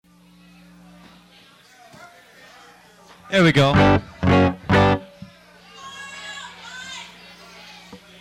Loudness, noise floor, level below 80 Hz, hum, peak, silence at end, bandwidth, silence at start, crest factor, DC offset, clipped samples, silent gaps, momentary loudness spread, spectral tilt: -17 LUFS; -51 dBFS; -42 dBFS; 60 Hz at -50 dBFS; -4 dBFS; 0.25 s; 12.5 kHz; 3.3 s; 20 dB; under 0.1%; under 0.1%; none; 27 LU; -6.5 dB/octave